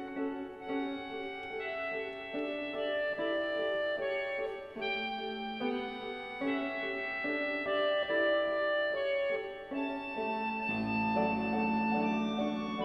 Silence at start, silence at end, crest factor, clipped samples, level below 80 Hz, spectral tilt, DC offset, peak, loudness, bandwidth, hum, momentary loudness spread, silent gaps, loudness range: 0 s; 0 s; 16 dB; under 0.1%; -66 dBFS; -6.5 dB/octave; under 0.1%; -18 dBFS; -34 LUFS; 6.2 kHz; none; 8 LU; none; 4 LU